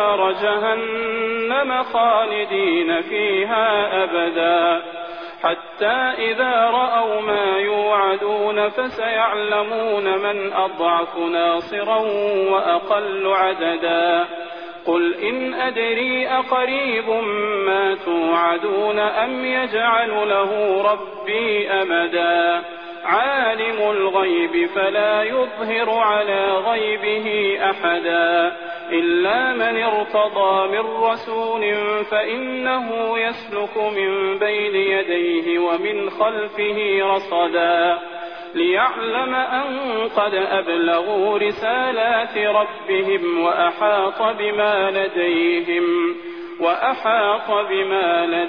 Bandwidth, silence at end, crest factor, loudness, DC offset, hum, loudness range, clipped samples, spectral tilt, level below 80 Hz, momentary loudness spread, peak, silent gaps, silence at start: 5.4 kHz; 0 s; 14 dB; -19 LUFS; 0.2%; none; 1 LU; under 0.1%; -6.5 dB/octave; -64 dBFS; 5 LU; -4 dBFS; none; 0 s